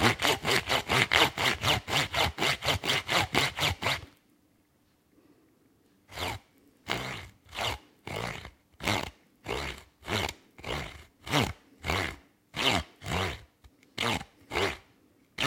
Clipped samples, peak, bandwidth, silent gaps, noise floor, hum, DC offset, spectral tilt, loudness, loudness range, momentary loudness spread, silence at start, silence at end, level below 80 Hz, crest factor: under 0.1%; -4 dBFS; 17 kHz; none; -68 dBFS; none; under 0.1%; -3 dB/octave; -29 LUFS; 12 LU; 18 LU; 0 s; 0 s; -50 dBFS; 28 dB